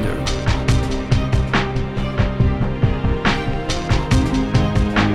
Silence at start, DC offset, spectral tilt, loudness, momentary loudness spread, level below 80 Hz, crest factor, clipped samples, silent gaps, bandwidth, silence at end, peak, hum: 0 s; under 0.1%; -6 dB/octave; -19 LUFS; 5 LU; -24 dBFS; 16 dB; under 0.1%; none; 12 kHz; 0 s; -2 dBFS; none